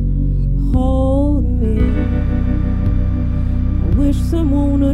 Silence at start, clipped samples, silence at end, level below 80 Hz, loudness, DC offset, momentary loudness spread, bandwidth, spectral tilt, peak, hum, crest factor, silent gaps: 0 s; under 0.1%; 0 s; -16 dBFS; -17 LUFS; under 0.1%; 3 LU; 8.6 kHz; -9.5 dB/octave; -4 dBFS; none; 10 dB; none